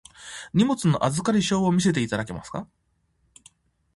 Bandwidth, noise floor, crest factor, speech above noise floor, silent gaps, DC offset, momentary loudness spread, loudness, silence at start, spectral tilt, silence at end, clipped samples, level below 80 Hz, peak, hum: 11.5 kHz; -68 dBFS; 18 dB; 46 dB; none; under 0.1%; 15 LU; -23 LUFS; 0.2 s; -5.5 dB/octave; 1.3 s; under 0.1%; -54 dBFS; -8 dBFS; none